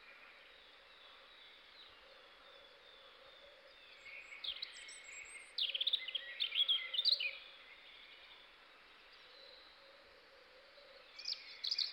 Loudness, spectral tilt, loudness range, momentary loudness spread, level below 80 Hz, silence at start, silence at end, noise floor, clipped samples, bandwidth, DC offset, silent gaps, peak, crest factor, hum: -38 LUFS; 2 dB/octave; 21 LU; 26 LU; -84 dBFS; 0 s; 0 s; -63 dBFS; under 0.1%; 16.5 kHz; under 0.1%; none; -22 dBFS; 22 dB; none